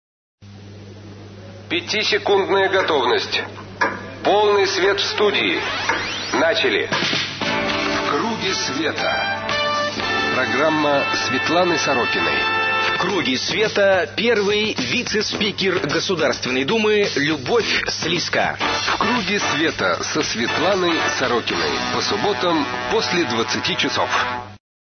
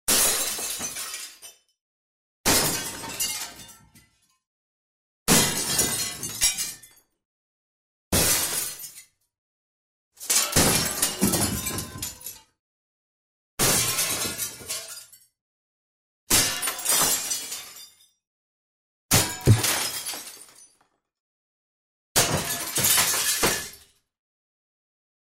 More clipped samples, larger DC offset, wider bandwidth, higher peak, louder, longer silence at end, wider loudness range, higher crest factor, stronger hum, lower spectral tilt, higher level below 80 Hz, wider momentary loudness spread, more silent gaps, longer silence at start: neither; neither; second, 6.6 kHz vs 16.5 kHz; about the same, -4 dBFS vs -6 dBFS; first, -19 LUFS vs -23 LUFS; second, 0.35 s vs 1.45 s; about the same, 2 LU vs 4 LU; second, 16 dB vs 22 dB; neither; about the same, -3 dB/octave vs -2 dB/octave; about the same, -52 dBFS vs -48 dBFS; second, 4 LU vs 17 LU; second, none vs 1.81-2.44 s, 4.47-5.26 s, 7.25-8.11 s, 9.38-10.11 s, 12.59-13.57 s, 15.41-16.27 s, 18.27-19.09 s, 21.20-22.15 s; first, 0.4 s vs 0.05 s